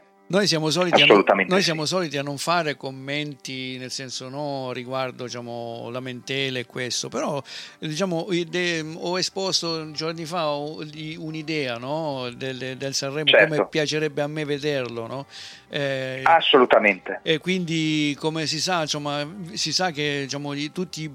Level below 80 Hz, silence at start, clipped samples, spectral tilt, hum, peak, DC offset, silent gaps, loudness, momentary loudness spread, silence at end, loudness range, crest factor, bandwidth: -68 dBFS; 0.3 s; under 0.1%; -3.5 dB/octave; none; -4 dBFS; under 0.1%; none; -23 LUFS; 16 LU; 0 s; 8 LU; 20 dB; 16 kHz